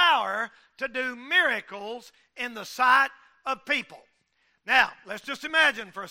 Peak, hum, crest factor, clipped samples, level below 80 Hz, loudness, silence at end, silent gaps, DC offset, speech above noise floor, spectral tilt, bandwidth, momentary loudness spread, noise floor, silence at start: -6 dBFS; none; 20 dB; under 0.1%; -68 dBFS; -25 LUFS; 0 s; none; under 0.1%; 44 dB; -1.5 dB/octave; 16 kHz; 16 LU; -70 dBFS; 0 s